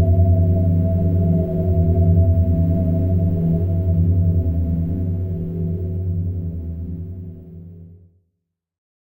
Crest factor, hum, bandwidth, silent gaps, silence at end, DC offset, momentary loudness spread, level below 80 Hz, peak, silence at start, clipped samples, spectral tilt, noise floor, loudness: 14 dB; none; 1.1 kHz; none; 1.2 s; under 0.1%; 14 LU; -32 dBFS; -6 dBFS; 0 s; under 0.1%; -13.5 dB/octave; -76 dBFS; -19 LUFS